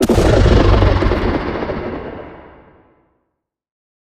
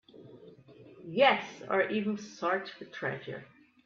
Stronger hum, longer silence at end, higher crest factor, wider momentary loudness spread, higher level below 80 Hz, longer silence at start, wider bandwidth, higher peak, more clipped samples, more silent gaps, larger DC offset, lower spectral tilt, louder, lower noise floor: neither; first, 1.6 s vs 0.4 s; second, 16 dB vs 24 dB; about the same, 18 LU vs 18 LU; first, -20 dBFS vs -78 dBFS; second, 0 s vs 0.15 s; first, 15 kHz vs 7.2 kHz; first, 0 dBFS vs -10 dBFS; neither; neither; neither; first, -7 dB/octave vs -5 dB/octave; first, -15 LUFS vs -31 LUFS; first, -74 dBFS vs -54 dBFS